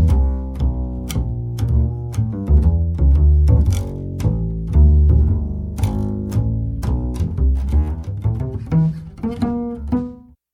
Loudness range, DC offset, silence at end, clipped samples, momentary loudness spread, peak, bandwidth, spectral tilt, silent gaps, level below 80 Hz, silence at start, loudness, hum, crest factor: 5 LU; under 0.1%; 0.35 s; under 0.1%; 10 LU; -2 dBFS; 10.5 kHz; -8.5 dB/octave; none; -18 dBFS; 0 s; -19 LUFS; none; 14 dB